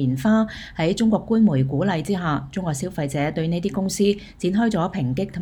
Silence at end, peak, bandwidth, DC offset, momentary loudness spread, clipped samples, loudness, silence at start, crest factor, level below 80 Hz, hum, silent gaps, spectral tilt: 0 s; -8 dBFS; 19 kHz; under 0.1%; 7 LU; under 0.1%; -22 LUFS; 0 s; 14 dB; -46 dBFS; none; none; -6.5 dB/octave